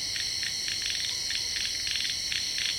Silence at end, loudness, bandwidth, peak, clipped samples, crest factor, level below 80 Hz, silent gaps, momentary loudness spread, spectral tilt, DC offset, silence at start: 0 s; -28 LUFS; 17 kHz; -14 dBFS; under 0.1%; 16 dB; -56 dBFS; none; 1 LU; 1.5 dB/octave; under 0.1%; 0 s